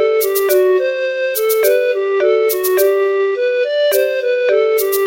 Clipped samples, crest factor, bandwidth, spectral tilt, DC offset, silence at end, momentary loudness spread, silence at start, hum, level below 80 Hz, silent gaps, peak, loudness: under 0.1%; 12 dB; 17 kHz; -1 dB/octave; under 0.1%; 0 s; 3 LU; 0 s; none; -66 dBFS; none; -2 dBFS; -14 LUFS